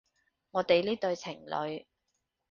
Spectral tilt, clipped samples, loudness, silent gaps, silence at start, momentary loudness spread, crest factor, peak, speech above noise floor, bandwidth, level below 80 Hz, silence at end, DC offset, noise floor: -5 dB/octave; under 0.1%; -31 LUFS; none; 0.55 s; 11 LU; 22 dB; -12 dBFS; 51 dB; 7.2 kHz; -72 dBFS; 0.7 s; under 0.1%; -82 dBFS